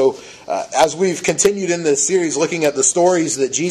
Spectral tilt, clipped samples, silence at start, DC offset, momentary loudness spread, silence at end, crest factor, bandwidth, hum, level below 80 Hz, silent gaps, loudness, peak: -3 dB/octave; under 0.1%; 0 s; under 0.1%; 6 LU; 0 s; 16 dB; 14 kHz; none; -56 dBFS; none; -16 LUFS; 0 dBFS